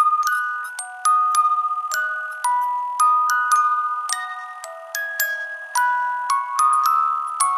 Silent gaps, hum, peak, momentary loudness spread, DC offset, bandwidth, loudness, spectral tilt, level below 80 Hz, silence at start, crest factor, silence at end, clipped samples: none; none; 0 dBFS; 11 LU; under 0.1%; 15.5 kHz; -20 LUFS; 8 dB/octave; under -90 dBFS; 0 s; 20 dB; 0 s; under 0.1%